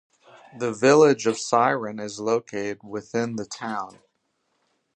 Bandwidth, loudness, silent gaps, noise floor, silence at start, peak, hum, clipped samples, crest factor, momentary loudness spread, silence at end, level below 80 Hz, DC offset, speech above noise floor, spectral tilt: 9.4 kHz; -23 LUFS; none; -73 dBFS; 0.55 s; -4 dBFS; none; under 0.1%; 20 dB; 15 LU; 1.05 s; -70 dBFS; under 0.1%; 50 dB; -4.5 dB/octave